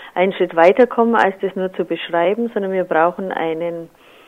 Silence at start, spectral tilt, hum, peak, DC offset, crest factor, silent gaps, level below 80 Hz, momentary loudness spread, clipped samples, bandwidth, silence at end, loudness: 0 s; -7 dB/octave; none; 0 dBFS; under 0.1%; 16 dB; none; -64 dBFS; 10 LU; under 0.1%; 9 kHz; 0.4 s; -17 LUFS